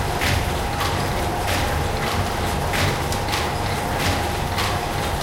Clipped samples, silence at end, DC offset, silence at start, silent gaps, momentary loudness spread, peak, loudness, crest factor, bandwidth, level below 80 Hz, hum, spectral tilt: under 0.1%; 0 s; under 0.1%; 0 s; none; 2 LU; -6 dBFS; -22 LUFS; 16 dB; 17 kHz; -30 dBFS; none; -4 dB/octave